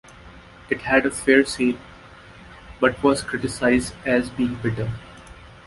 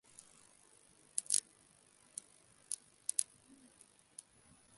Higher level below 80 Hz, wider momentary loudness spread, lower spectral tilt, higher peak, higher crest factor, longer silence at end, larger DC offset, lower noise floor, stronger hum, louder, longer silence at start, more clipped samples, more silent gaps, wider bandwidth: first, -46 dBFS vs -86 dBFS; second, 11 LU vs 25 LU; first, -5 dB/octave vs 1.5 dB/octave; first, -2 dBFS vs -8 dBFS; second, 20 dB vs 38 dB; second, 0.15 s vs 1.55 s; neither; second, -45 dBFS vs -68 dBFS; neither; first, -21 LUFS vs -39 LUFS; second, 0.25 s vs 1.15 s; neither; neither; about the same, 11.5 kHz vs 12 kHz